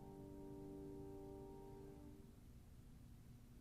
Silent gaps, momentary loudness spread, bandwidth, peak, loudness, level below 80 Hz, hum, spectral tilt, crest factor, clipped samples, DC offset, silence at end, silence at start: none; 9 LU; 15 kHz; -44 dBFS; -58 LUFS; -66 dBFS; none; -7.5 dB/octave; 14 dB; under 0.1%; under 0.1%; 0 s; 0 s